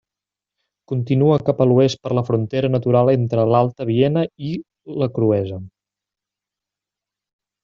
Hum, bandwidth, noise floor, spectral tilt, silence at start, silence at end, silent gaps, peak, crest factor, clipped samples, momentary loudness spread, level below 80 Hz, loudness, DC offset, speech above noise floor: none; 7.2 kHz; -88 dBFS; -8 dB/octave; 0.9 s; 1.95 s; none; -4 dBFS; 16 dB; under 0.1%; 12 LU; -58 dBFS; -18 LUFS; under 0.1%; 70 dB